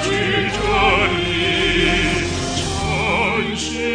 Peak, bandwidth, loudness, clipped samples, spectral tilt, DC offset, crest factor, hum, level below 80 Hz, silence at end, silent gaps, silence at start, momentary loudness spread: -4 dBFS; 10 kHz; -17 LUFS; under 0.1%; -4 dB/octave; under 0.1%; 14 dB; none; -32 dBFS; 0 s; none; 0 s; 6 LU